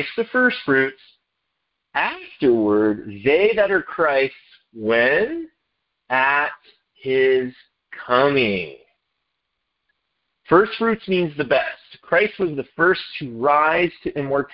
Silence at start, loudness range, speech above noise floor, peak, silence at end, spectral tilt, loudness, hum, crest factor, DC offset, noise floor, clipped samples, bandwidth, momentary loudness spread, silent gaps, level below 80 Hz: 0 s; 3 LU; 57 dB; -2 dBFS; 0.1 s; -10 dB/octave; -19 LUFS; none; 20 dB; under 0.1%; -77 dBFS; under 0.1%; 5.6 kHz; 11 LU; none; -56 dBFS